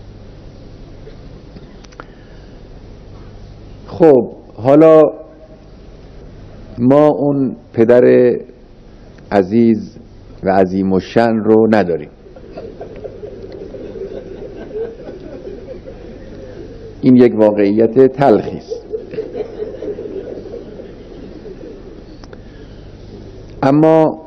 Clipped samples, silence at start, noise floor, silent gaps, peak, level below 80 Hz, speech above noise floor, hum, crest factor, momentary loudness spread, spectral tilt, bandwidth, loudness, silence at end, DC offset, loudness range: 0.4%; 0.05 s; -39 dBFS; none; 0 dBFS; -40 dBFS; 28 dB; none; 16 dB; 25 LU; -9 dB/octave; 7 kHz; -13 LUFS; 0.05 s; under 0.1%; 16 LU